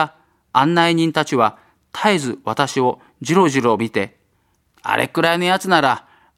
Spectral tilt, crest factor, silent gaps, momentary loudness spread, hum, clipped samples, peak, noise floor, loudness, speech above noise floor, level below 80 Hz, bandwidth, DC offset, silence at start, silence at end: -5 dB/octave; 18 dB; none; 9 LU; none; under 0.1%; 0 dBFS; -63 dBFS; -18 LUFS; 46 dB; -62 dBFS; 15.5 kHz; under 0.1%; 0 s; 0.35 s